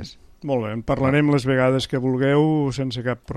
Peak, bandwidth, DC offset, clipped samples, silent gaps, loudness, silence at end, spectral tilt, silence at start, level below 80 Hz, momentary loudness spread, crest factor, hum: -6 dBFS; 12 kHz; under 0.1%; under 0.1%; none; -21 LUFS; 0 s; -7 dB/octave; 0 s; -46 dBFS; 8 LU; 14 dB; none